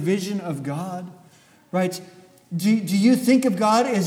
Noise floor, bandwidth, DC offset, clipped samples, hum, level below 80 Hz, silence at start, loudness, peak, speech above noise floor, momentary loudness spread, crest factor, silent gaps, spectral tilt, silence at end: -53 dBFS; 17 kHz; under 0.1%; under 0.1%; none; -72 dBFS; 0 s; -21 LUFS; -6 dBFS; 33 dB; 15 LU; 16 dB; none; -6 dB/octave; 0 s